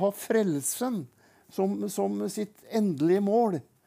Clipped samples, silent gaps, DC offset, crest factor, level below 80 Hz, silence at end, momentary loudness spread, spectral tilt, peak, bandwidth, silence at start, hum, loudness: under 0.1%; none; under 0.1%; 16 dB; -82 dBFS; 0.25 s; 11 LU; -5.5 dB/octave; -12 dBFS; 16 kHz; 0 s; none; -28 LUFS